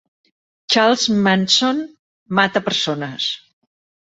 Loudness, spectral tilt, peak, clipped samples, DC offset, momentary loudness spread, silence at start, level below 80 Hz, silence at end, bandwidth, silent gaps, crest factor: -17 LUFS; -3.5 dB/octave; -2 dBFS; under 0.1%; under 0.1%; 10 LU; 0.7 s; -62 dBFS; 0.7 s; 8.2 kHz; 1.99-2.26 s; 18 dB